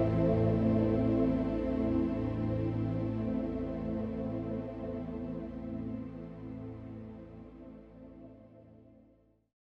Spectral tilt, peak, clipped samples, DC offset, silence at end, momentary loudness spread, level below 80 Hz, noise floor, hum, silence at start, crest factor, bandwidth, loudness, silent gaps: -10.5 dB/octave; -18 dBFS; under 0.1%; under 0.1%; 0.85 s; 21 LU; -48 dBFS; -66 dBFS; none; 0 s; 16 dB; 5.6 kHz; -33 LUFS; none